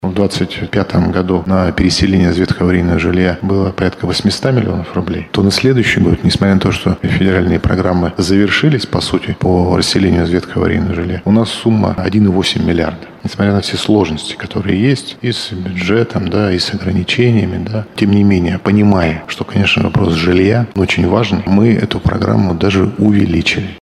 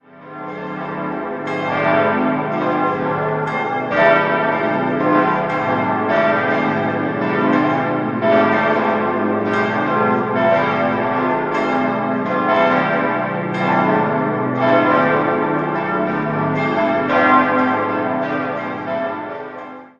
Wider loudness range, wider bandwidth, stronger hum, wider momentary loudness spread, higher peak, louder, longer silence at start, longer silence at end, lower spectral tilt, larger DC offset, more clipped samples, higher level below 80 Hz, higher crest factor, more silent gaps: about the same, 3 LU vs 1 LU; first, 12.5 kHz vs 7.2 kHz; neither; second, 6 LU vs 9 LU; about the same, 0 dBFS vs 0 dBFS; first, -13 LUFS vs -17 LUFS; second, 0 s vs 0.15 s; about the same, 0.1 s vs 0.1 s; second, -6 dB/octave vs -8 dB/octave; neither; neither; first, -32 dBFS vs -56 dBFS; about the same, 12 dB vs 16 dB; neither